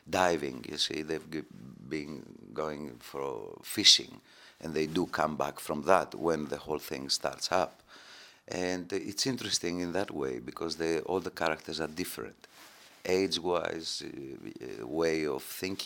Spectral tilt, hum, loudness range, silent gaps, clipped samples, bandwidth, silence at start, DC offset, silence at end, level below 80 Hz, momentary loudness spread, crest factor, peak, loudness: -3 dB/octave; none; 7 LU; none; under 0.1%; 17.5 kHz; 0.05 s; under 0.1%; 0 s; -66 dBFS; 16 LU; 26 dB; -6 dBFS; -31 LUFS